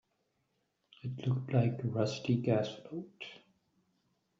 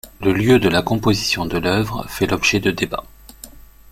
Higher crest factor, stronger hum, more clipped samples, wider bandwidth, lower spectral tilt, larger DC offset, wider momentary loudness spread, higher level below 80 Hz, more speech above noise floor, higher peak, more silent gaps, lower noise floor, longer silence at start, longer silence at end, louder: about the same, 20 dB vs 18 dB; neither; neither; second, 7.6 kHz vs 16.5 kHz; first, -7 dB/octave vs -5 dB/octave; neither; first, 16 LU vs 9 LU; second, -72 dBFS vs -40 dBFS; first, 46 dB vs 23 dB; second, -16 dBFS vs -2 dBFS; neither; first, -80 dBFS vs -41 dBFS; first, 1.05 s vs 0.05 s; first, 1 s vs 0.35 s; second, -34 LUFS vs -18 LUFS